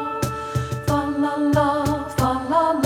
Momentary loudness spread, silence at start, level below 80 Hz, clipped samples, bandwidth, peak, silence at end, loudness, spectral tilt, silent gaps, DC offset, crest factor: 7 LU; 0 s; -40 dBFS; under 0.1%; 17 kHz; -6 dBFS; 0 s; -22 LUFS; -6.5 dB/octave; none; under 0.1%; 16 dB